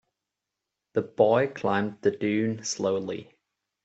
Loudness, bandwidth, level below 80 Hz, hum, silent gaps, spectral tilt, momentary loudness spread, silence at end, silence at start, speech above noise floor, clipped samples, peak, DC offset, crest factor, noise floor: -27 LUFS; 8.2 kHz; -70 dBFS; none; none; -5 dB/octave; 10 LU; 0.6 s; 0.95 s; 60 dB; under 0.1%; -8 dBFS; under 0.1%; 20 dB; -86 dBFS